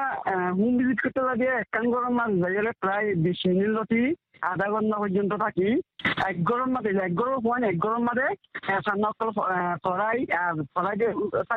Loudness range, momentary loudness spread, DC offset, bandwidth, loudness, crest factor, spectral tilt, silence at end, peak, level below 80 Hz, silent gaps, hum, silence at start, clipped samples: 1 LU; 3 LU; under 0.1%; 4.9 kHz; -26 LUFS; 16 dB; -8.5 dB/octave; 0 s; -10 dBFS; -62 dBFS; none; none; 0 s; under 0.1%